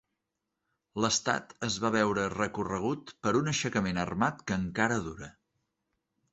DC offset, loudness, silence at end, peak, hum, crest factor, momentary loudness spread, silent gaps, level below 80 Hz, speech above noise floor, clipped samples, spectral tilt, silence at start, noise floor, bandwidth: under 0.1%; -30 LUFS; 1 s; -10 dBFS; none; 22 dB; 7 LU; none; -58 dBFS; 55 dB; under 0.1%; -4 dB/octave; 0.95 s; -85 dBFS; 8.2 kHz